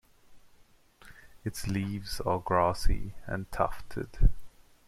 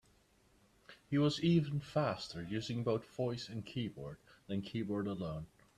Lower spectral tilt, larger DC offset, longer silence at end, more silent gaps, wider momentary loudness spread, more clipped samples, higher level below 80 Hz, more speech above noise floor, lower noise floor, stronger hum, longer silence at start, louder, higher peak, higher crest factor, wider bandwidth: about the same, -6 dB/octave vs -7 dB/octave; neither; about the same, 0.4 s vs 0.3 s; neither; about the same, 12 LU vs 12 LU; neither; first, -34 dBFS vs -66 dBFS; about the same, 32 dB vs 33 dB; second, -60 dBFS vs -70 dBFS; neither; second, 0.3 s vs 0.9 s; first, -32 LUFS vs -38 LUFS; first, -10 dBFS vs -20 dBFS; about the same, 20 dB vs 18 dB; first, 14 kHz vs 12 kHz